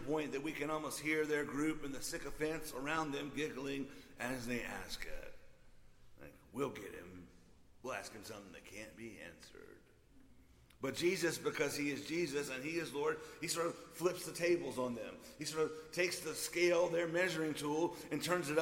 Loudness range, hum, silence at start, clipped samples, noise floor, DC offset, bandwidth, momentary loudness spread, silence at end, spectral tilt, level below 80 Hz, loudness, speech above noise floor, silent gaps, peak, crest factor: 12 LU; none; 0 s; under 0.1%; -64 dBFS; under 0.1%; 16.5 kHz; 16 LU; 0 s; -4 dB/octave; -62 dBFS; -39 LUFS; 24 dB; none; -22 dBFS; 20 dB